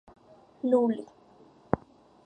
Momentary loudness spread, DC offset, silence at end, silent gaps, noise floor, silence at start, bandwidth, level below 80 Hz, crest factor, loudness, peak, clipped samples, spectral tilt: 11 LU; under 0.1%; 0.5 s; none; -57 dBFS; 0.65 s; 9 kHz; -60 dBFS; 26 dB; -29 LUFS; -6 dBFS; under 0.1%; -9 dB/octave